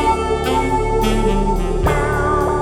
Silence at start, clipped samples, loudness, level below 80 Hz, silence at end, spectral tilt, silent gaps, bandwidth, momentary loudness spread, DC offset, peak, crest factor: 0 s; under 0.1%; -18 LUFS; -22 dBFS; 0 s; -6 dB/octave; none; 16.5 kHz; 2 LU; under 0.1%; -4 dBFS; 12 dB